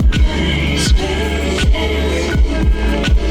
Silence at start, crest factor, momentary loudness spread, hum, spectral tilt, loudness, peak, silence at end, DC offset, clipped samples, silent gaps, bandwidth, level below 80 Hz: 0 s; 10 dB; 2 LU; none; -5 dB/octave; -16 LUFS; -4 dBFS; 0 s; under 0.1%; under 0.1%; none; 13 kHz; -16 dBFS